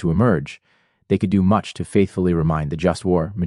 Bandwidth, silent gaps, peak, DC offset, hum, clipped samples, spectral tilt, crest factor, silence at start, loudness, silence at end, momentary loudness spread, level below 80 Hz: 11.5 kHz; none; -4 dBFS; under 0.1%; none; under 0.1%; -8 dB/octave; 16 dB; 0 s; -20 LUFS; 0 s; 5 LU; -42 dBFS